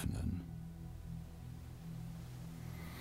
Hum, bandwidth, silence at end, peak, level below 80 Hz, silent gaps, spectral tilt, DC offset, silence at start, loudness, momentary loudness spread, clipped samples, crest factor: none; 16 kHz; 0 s; -28 dBFS; -52 dBFS; none; -6.5 dB/octave; under 0.1%; 0 s; -47 LUFS; 9 LU; under 0.1%; 18 dB